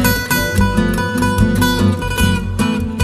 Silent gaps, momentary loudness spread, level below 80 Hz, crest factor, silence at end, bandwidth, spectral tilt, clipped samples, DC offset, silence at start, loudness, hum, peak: none; 4 LU; -24 dBFS; 14 dB; 0 s; 14 kHz; -5 dB/octave; under 0.1%; under 0.1%; 0 s; -15 LUFS; none; 0 dBFS